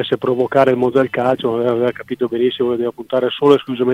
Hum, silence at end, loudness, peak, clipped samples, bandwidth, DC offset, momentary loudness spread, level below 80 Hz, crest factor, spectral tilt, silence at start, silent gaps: none; 0 s; -16 LUFS; 0 dBFS; under 0.1%; 10 kHz; under 0.1%; 6 LU; -58 dBFS; 16 dB; -7 dB/octave; 0 s; none